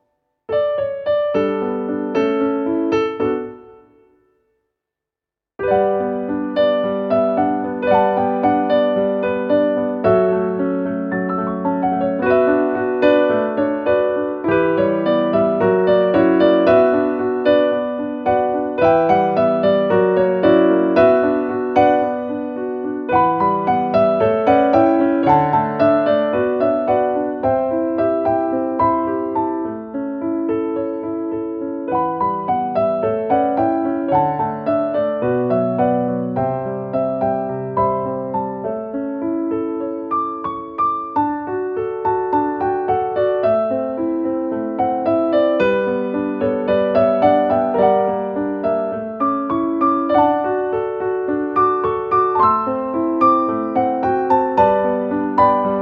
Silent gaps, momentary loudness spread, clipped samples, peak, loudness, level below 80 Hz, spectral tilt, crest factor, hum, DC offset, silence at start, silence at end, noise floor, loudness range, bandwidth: none; 8 LU; under 0.1%; -2 dBFS; -18 LUFS; -52 dBFS; -9 dB/octave; 16 dB; none; under 0.1%; 0.5 s; 0 s; -87 dBFS; 6 LU; 6.2 kHz